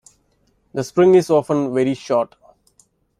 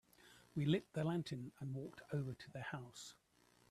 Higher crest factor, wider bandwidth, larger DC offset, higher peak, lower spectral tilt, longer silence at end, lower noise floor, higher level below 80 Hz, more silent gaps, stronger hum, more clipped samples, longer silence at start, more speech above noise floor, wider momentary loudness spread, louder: about the same, 16 dB vs 20 dB; about the same, 13 kHz vs 13.5 kHz; neither; first, -4 dBFS vs -24 dBFS; about the same, -6.5 dB/octave vs -6.5 dB/octave; first, 0.95 s vs 0.6 s; second, -62 dBFS vs -67 dBFS; first, -60 dBFS vs -76 dBFS; neither; neither; neither; first, 0.75 s vs 0.2 s; first, 46 dB vs 24 dB; about the same, 15 LU vs 16 LU; first, -17 LUFS vs -44 LUFS